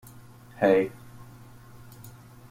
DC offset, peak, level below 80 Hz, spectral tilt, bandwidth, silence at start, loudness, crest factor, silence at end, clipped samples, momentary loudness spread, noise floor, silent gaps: under 0.1%; -8 dBFS; -60 dBFS; -7 dB/octave; 16.5 kHz; 0.6 s; -25 LUFS; 22 dB; 0.4 s; under 0.1%; 27 LU; -49 dBFS; none